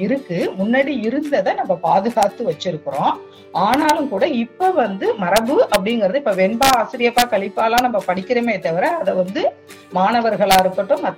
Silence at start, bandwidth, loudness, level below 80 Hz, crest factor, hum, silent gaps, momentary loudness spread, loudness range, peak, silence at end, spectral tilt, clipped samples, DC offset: 0 s; 17 kHz; -18 LUFS; -50 dBFS; 16 dB; none; none; 6 LU; 2 LU; 0 dBFS; 0 s; -4.5 dB/octave; under 0.1%; under 0.1%